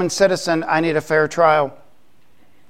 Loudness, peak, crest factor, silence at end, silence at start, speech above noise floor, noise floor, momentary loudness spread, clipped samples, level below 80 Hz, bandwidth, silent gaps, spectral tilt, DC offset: -17 LUFS; -2 dBFS; 18 dB; 0.95 s; 0 s; 42 dB; -59 dBFS; 4 LU; under 0.1%; -58 dBFS; 16 kHz; none; -4.5 dB/octave; 0.7%